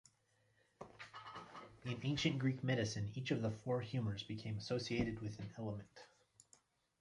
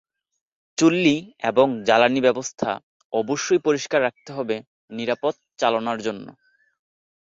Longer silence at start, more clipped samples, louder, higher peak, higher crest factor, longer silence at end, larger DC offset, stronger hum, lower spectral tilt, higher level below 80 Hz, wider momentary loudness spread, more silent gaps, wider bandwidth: about the same, 0.8 s vs 0.8 s; neither; second, -42 LUFS vs -22 LUFS; second, -24 dBFS vs -4 dBFS; about the same, 18 dB vs 20 dB; about the same, 0.95 s vs 0.9 s; neither; neither; first, -6 dB/octave vs -4.5 dB/octave; about the same, -66 dBFS vs -66 dBFS; first, 17 LU vs 13 LU; second, none vs 2.83-3.10 s, 4.67-4.88 s; first, 11 kHz vs 8 kHz